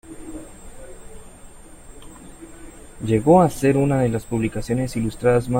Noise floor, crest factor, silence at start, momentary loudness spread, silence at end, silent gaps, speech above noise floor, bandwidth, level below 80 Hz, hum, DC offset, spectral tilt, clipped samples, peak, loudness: -42 dBFS; 20 dB; 0.05 s; 27 LU; 0 s; none; 23 dB; 16.5 kHz; -42 dBFS; none; under 0.1%; -7.5 dB/octave; under 0.1%; -2 dBFS; -20 LUFS